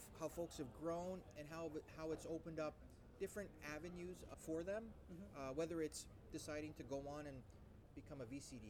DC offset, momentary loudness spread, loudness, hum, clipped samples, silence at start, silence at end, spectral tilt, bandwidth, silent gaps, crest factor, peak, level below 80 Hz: under 0.1%; 11 LU; -51 LUFS; none; under 0.1%; 0 s; 0 s; -5.5 dB/octave; 19 kHz; none; 16 dB; -34 dBFS; -66 dBFS